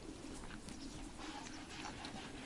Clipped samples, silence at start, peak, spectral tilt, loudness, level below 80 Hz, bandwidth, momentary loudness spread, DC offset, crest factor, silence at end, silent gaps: under 0.1%; 0 s; -28 dBFS; -3.5 dB/octave; -49 LUFS; -58 dBFS; 11.5 kHz; 3 LU; under 0.1%; 20 dB; 0 s; none